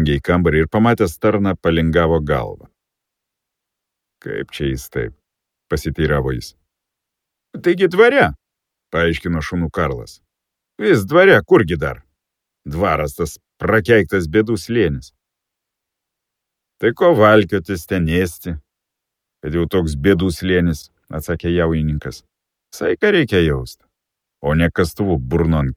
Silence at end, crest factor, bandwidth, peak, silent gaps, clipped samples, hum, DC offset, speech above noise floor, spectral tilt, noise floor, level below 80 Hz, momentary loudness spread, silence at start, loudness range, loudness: 0 s; 18 dB; 16.5 kHz; 0 dBFS; none; under 0.1%; none; under 0.1%; 65 dB; -6.5 dB/octave; -81 dBFS; -34 dBFS; 16 LU; 0 s; 7 LU; -17 LUFS